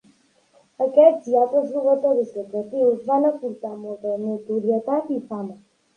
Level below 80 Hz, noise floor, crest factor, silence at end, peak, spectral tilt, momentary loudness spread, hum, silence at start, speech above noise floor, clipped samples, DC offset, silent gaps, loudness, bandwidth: -76 dBFS; -59 dBFS; 20 dB; 0.4 s; -2 dBFS; -8.5 dB/octave; 15 LU; none; 0.8 s; 38 dB; under 0.1%; under 0.1%; none; -21 LUFS; 9.2 kHz